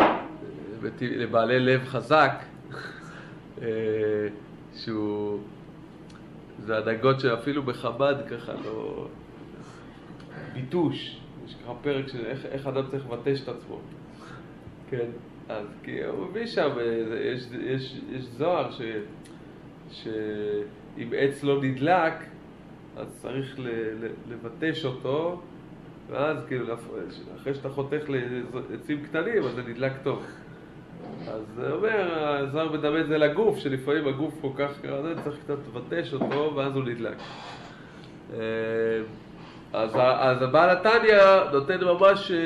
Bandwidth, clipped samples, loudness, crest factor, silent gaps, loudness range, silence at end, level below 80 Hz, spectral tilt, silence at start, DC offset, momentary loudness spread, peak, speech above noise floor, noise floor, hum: 12 kHz; under 0.1%; -27 LUFS; 22 dB; none; 7 LU; 0 s; -60 dBFS; -7 dB/octave; 0 s; under 0.1%; 22 LU; -6 dBFS; 20 dB; -46 dBFS; none